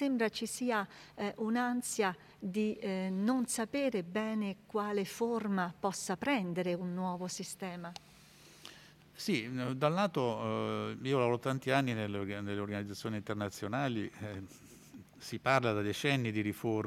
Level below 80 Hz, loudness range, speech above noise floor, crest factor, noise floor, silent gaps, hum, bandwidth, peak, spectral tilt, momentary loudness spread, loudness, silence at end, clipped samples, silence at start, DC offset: -74 dBFS; 5 LU; 24 dB; 22 dB; -59 dBFS; none; none; 16 kHz; -12 dBFS; -5 dB/octave; 13 LU; -35 LUFS; 0 s; under 0.1%; 0 s; under 0.1%